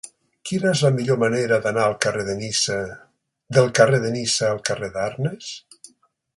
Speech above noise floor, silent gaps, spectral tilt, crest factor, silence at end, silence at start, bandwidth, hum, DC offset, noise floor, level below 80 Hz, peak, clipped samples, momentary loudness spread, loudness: 39 dB; none; -4.5 dB/octave; 20 dB; 0.8 s; 0.05 s; 11.5 kHz; none; under 0.1%; -59 dBFS; -56 dBFS; 0 dBFS; under 0.1%; 16 LU; -21 LUFS